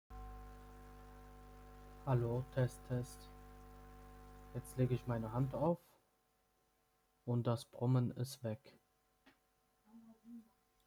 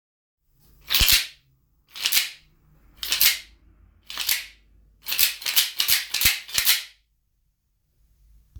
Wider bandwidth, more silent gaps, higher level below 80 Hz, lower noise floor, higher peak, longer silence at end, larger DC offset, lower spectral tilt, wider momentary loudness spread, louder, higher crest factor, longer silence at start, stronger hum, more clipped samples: about the same, over 20 kHz vs over 20 kHz; neither; second, -60 dBFS vs -44 dBFS; first, -79 dBFS vs -70 dBFS; second, -24 dBFS vs 0 dBFS; second, 0.45 s vs 1.7 s; neither; first, -7.5 dB/octave vs 1.5 dB/octave; first, 22 LU vs 17 LU; second, -40 LUFS vs -20 LUFS; second, 18 dB vs 26 dB; second, 0.1 s vs 0.9 s; neither; neither